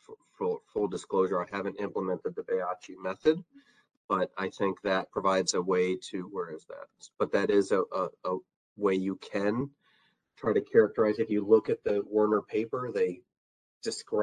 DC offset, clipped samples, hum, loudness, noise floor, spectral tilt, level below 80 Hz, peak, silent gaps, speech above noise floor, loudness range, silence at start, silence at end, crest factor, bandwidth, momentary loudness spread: under 0.1%; under 0.1%; none; -30 LUFS; -69 dBFS; -5 dB/octave; -68 dBFS; -10 dBFS; 3.97-4.09 s, 8.56-8.76 s, 13.37-13.81 s; 40 dB; 4 LU; 0.1 s; 0 s; 20 dB; 10 kHz; 12 LU